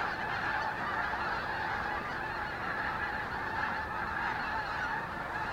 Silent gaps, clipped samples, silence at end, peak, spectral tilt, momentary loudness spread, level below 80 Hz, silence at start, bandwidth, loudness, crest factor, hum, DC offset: none; under 0.1%; 0 s; -20 dBFS; -5 dB/octave; 3 LU; -54 dBFS; 0 s; 16.5 kHz; -34 LUFS; 14 dB; none; under 0.1%